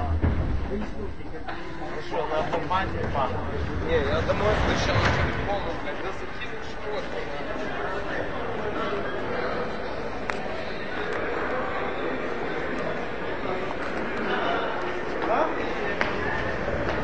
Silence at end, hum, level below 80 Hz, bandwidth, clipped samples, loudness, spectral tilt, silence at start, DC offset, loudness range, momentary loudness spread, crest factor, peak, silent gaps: 0 s; none; -38 dBFS; 8 kHz; under 0.1%; -28 LUFS; -6 dB/octave; 0 s; 2%; 5 LU; 9 LU; 24 dB; -4 dBFS; none